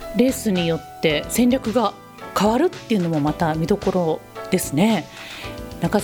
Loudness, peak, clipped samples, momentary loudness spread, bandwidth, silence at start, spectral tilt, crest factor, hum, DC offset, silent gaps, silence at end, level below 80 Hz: -21 LUFS; -4 dBFS; under 0.1%; 11 LU; over 20 kHz; 0 s; -5.5 dB/octave; 16 dB; none; under 0.1%; none; 0 s; -44 dBFS